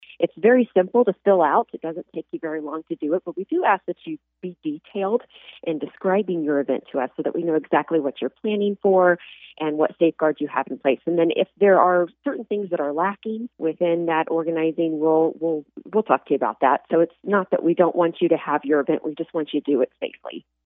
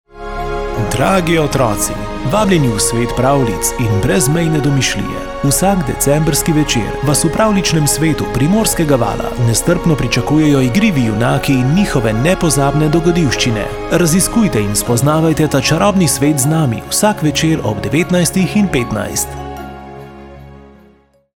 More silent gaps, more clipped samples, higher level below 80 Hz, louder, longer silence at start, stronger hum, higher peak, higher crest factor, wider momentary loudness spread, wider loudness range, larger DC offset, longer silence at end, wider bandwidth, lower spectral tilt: neither; neither; second, -76 dBFS vs -28 dBFS; second, -22 LUFS vs -13 LUFS; about the same, 0.2 s vs 0.15 s; neither; about the same, -2 dBFS vs 0 dBFS; first, 20 dB vs 14 dB; first, 13 LU vs 7 LU; first, 5 LU vs 2 LU; neither; second, 0.25 s vs 0.7 s; second, 3.9 kHz vs 17.5 kHz; first, -10.5 dB/octave vs -5 dB/octave